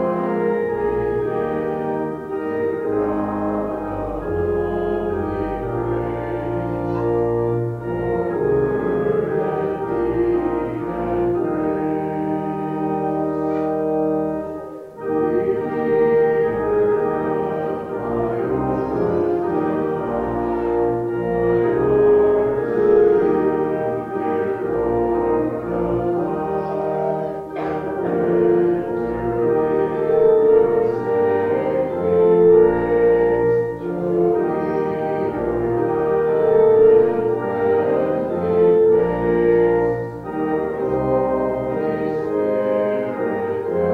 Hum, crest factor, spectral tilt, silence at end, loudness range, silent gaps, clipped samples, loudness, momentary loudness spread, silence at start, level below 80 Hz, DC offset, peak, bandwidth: none; 16 dB; -9.5 dB/octave; 0 s; 6 LU; none; under 0.1%; -20 LUFS; 9 LU; 0 s; -44 dBFS; under 0.1%; -4 dBFS; 4.4 kHz